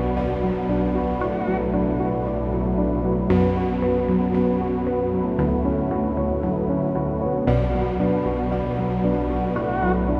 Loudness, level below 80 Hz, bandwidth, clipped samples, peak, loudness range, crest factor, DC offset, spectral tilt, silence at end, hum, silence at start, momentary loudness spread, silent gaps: -22 LUFS; -30 dBFS; 5 kHz; under 0.1%; -4 dBFS; 1 LU; 16 dB; under 0.1%; -10.5 dB/octave; 0 s; none; 0 s; 3 LU; none